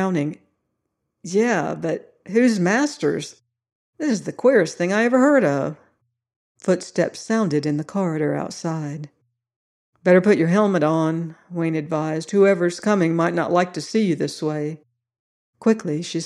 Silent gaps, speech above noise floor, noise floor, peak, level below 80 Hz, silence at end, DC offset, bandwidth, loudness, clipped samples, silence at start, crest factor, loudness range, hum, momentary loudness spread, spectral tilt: 3.72-3.93 s, 6.36-6.55 s, 9.56-9.93 s, 15.19-15.53 s; 57 dB; -77 dBFS; -4 dBFS; -70 dBFS; 0 s; under 0.1%; 12 kHz; -21 LUFS; under 0.1%; 0 s; 18 dB; 4 LU; none; 12 LU; -6 dB/octave